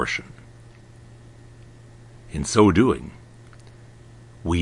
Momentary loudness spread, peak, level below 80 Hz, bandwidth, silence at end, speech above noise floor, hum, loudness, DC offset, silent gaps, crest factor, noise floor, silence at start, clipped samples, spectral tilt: 22 LU; -2 dBFS; -46 dBFS; 11 kHz; 0 s; 27 dB; none; -21 LUFS; under 0.1%; none; 22 dB; -46 dBFS; 0 s; under 0.1%; -5.5 dB/octave